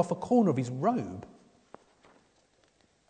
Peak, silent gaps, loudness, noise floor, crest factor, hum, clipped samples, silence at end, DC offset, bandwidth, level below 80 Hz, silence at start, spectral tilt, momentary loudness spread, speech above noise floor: -12 dBFS; none; -28 LUFS; -68 dBFS; 20 dB; none; under 0.1%; 1.85 s; under 0.1%; 9.4 kHz; -70 dBFS; 0 s; -8 dB/octave; 15 LU; 39 dB